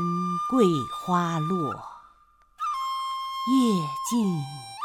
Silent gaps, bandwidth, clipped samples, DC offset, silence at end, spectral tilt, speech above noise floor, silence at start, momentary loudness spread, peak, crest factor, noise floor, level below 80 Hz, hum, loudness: none; 18 kHz; under 0.1%; under 0.1%; 0 s; -6 dB/octave; 35 dB; 0 s; 10 LU; -8 dBFS; 18 dB; -59 dBFS; -64 dBFS; none; -26 LUFS